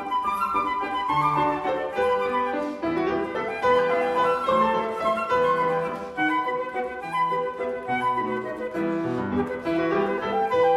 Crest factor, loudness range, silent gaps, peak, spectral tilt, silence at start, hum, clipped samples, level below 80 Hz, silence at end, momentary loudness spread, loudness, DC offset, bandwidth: 14 dB; 3 LU; none; -10 dBFS; -6 dB/octave; 0 s; none; under 0.1%; -56 dBFS; 0 s; 7 LU; -25 LUFS; under 0.1%; 12.5 kHz